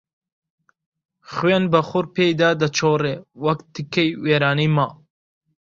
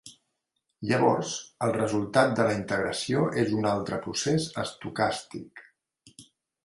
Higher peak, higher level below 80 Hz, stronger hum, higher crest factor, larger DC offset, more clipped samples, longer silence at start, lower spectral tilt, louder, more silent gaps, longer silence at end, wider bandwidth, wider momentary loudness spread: first, -2 dBFS vs -6 dBFS; about the same, -58 dBFS vs -60 dBFS; neither; about the same, 20 dB vs 22 dB; neither; neither; first, 1.3 s vs 0.05 s; about the same, -5.5 dB/octave vs -5 dB/octave; first, -20 LUFS vs -27 LUFS; neither; first, 0.8 s vs 0.45 s; second, 7.6 kHz vs 11.5 kHz; second, 8 LU vs 11 LU